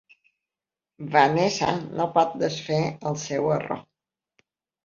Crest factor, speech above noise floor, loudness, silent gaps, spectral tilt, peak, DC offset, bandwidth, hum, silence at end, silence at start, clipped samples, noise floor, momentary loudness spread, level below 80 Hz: 22 dB; over 66 dB; -24 LUFS; none; -5 dB/octave; -4 dBFS; under 0.1%; 7.6 kHz; none; 1.05 s; 1 s; under 0.1%; under -90 dBFS; 10 LU; -62 dBFS